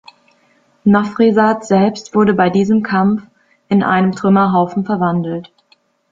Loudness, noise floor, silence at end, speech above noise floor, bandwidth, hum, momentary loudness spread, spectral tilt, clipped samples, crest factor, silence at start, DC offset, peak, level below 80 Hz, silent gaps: -14 LUFS; -56 dBFS; 0.7 s; 43 dB; 7.6 kHz; none; 6 LU; -7.5 dB/octave; under 0.1%; 14 dB; 0.85 s; under 0.1%; -2 dBFS; -54 dBFS; none